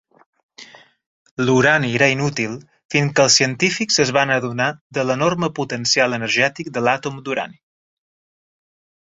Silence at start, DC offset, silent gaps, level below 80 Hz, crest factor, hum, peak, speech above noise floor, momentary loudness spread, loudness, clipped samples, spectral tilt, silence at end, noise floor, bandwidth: 0.6 s; under 0.1%; 1.06-1.37 s, 2.85-2.89 s, 4.81-4.90 s; -58 dBFS; 18 dB; none; -2 dBFS; 25 dB; 11 LU; -18 LUFS; under 0.1%; -3.5 dB/octave; 1.55 s; -44 dBFS; 7.8 kHz